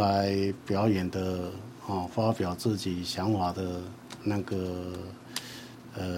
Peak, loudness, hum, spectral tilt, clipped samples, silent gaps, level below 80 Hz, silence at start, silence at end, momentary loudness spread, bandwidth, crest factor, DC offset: -12 dBFS; -31 LUFS; none; -6 dB/octave; under 0.1%; none; -58 dBFS; 0 s; 0 s; 13 LU; 16 kHz; 18 dB; under 0.1%